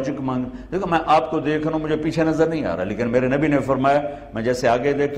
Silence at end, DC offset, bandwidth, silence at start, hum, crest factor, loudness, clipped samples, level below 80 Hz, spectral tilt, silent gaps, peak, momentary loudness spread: 0 s; under 0.1%; 12 kHz; 0 s; none; 14 dB; -21 LUFS; under 0.1%; -44 dBFS; -6.5 dB/octave; none; -6 dBFS; 7 LU